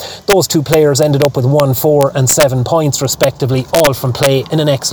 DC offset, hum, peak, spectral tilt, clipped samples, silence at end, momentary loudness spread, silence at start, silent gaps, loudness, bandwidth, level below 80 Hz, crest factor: under 0.1%; none; -2 dBFS; -4.5 dB/octave; under 0.1%; 0 s; 4 LU; 0 s; none; -11 LUFS; over 20 kHz; -42 dBFS; 10 dB